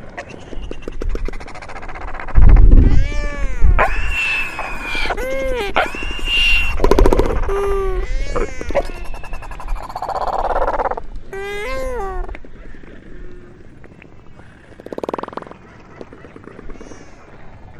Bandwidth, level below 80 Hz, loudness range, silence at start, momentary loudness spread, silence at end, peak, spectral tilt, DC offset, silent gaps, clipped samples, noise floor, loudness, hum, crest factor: 11.5 kHz; -18 dBFS; 16 LU; 0 s; 24 LU; 0 s; 0 dBFS; -5.5 dB/octave; under 0.1%; none; under 0.1%; -39 dBFS; -19 LUFS; none; 16 dB